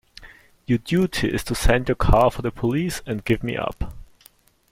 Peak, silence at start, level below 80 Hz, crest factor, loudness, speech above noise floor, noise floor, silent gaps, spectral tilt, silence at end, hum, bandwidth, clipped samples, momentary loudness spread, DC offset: -4 dBFS; 0.2 s; -30 dBFS; 20 dB; -22 LUFS; 34 dB; -55 dBFS; none; -6 dB/octave; 0.65 s; none; 16.5 kHz; under 0.1%; 11 LU; under 0.1%